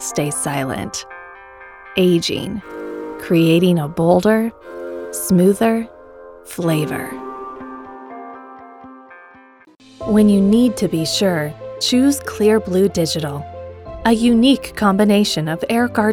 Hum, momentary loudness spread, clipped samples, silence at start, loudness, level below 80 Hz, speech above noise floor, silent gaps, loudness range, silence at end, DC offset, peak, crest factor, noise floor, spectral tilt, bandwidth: none; 20 LU; under 0.1%; 0 s; -17 LUFS; -46 dBFS; 31 dB; none; 10 LU; 0 s; under 0.1%; -2 dBFS; 16 dB; -47 dBFS; -5.5 dB/octave; 17.5 kHz